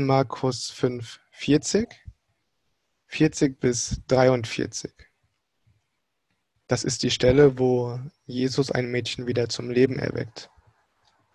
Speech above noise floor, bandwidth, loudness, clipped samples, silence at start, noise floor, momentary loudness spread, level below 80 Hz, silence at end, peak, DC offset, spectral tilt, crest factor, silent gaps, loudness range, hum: 54 dB; 11.5 kHz; -24 LUFS; under 0.1%; 0 s; -78 dBFS; 15 LU; -48 dBFS; 0.9 s; -4 dBFS; under 0.1%; -5 dB/octave; 20 dB; none; 4 LU; none